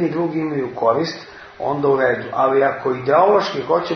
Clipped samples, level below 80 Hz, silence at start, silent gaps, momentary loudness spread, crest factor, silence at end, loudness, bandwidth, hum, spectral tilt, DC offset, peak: under 0.1%; -58 dBFS; 0 s; none; 10 LU; 16 dB; 0 s; -18 LUFS; 6.6 kHz; none; -6.5 dB/octave; under 0.1%; -2 dBFS